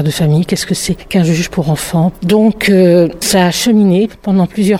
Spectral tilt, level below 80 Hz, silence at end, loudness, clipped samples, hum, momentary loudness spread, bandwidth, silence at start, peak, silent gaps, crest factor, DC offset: -5.5 dB/octave; -38 dBFS; 0 s; -12 LUFS; under 0.1%; none; 6 LU; 16.5 kHz; 0 s; 0 dBFS; none; 10 dB; under 0.1%